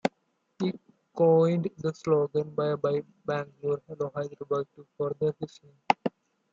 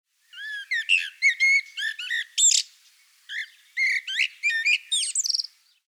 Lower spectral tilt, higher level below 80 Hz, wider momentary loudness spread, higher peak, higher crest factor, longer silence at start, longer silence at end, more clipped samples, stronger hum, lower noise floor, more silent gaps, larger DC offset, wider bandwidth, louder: first, -7.5 dB/octave vs 13.5 dB/octave; first, -72 dBFS vs under -90 dBFS; second, 13 LU vs 16 LU; about the same, -6 dBFS vs -8 dBFS; first, 24 dB vs 18 dB; second, 0.05 s vs 0.35 s; about the same, 0.45 s vs 0.45 s; neither; neither; first, -74 dBFS vs -58 dBFS; neither; neither; second, 7.8 kHz vs over 20 kHz; second, -29 LUFS vs -22 LUFS